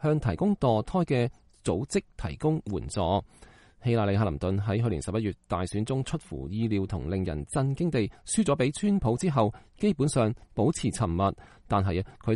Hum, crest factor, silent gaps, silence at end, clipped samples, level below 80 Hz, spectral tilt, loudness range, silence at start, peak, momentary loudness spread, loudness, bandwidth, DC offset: none; 16 dB; none; 0 s; under 0.1%; -46 dBFS; -6.5 dB/octave; 3 LU; 0 s; -12 dBFS; 6 LU; -28 LUFS; 11.5 kHz; under 0.1%